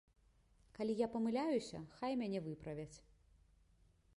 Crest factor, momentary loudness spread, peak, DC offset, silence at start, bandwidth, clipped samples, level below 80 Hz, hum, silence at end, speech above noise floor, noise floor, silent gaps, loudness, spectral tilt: 18 dB; 12 LU; -26 dBFS; under 0.1%; 0.75 s; 11.5 kHz; under 0.1%; -70 dBFS; none; 1.15 s; 31 dB; -72 dBFS; none; -42 LUFS; -6.5 dB/octave